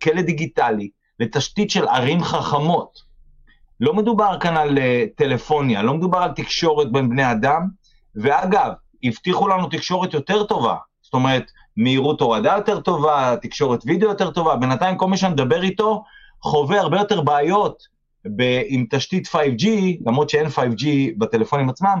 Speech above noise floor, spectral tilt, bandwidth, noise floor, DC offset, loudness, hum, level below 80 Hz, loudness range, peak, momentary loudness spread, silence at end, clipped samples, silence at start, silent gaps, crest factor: 33 dB; -6 dB/octave; 7.6 kHz; -51 dBFS; under 0.1%; -19 LUFS; none; -50 dBFS; 2 LU; -6 dBFS; 5 LU; 0 s; under 0.1%; 0 s; none; 14 dB